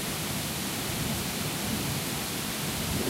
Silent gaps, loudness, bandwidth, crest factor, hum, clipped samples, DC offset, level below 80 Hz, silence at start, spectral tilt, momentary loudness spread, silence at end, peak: none; -30 LUFS; 16 kHz; 14 dB; none; under 0.1%; under 0.1%; -48 dBFS; 0 s; -3 dB/octave; 1 LU; 0 s; -18 dBFS